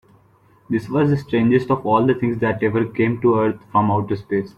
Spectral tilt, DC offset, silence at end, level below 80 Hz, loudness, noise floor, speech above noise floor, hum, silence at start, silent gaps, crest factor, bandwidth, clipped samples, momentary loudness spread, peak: -9 dB/octave; under 0.1%; 0.05 s; -52 dBFS; -19 LUFS; -54 dBFS; 36 dB; none; 0.7 s; none; 16 dB; 8.4 kHz; under 0.1%; 5 LU; -4 dBFS